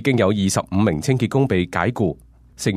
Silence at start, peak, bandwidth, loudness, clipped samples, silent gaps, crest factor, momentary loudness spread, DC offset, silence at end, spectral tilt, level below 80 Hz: 0 s; -2 dBFS; 15 kHz; -20 LUFS; under 0.1%; none; 16 dB; 6 LU; under 0.1%; 0 s; -6 dB/octave; -46 dBFS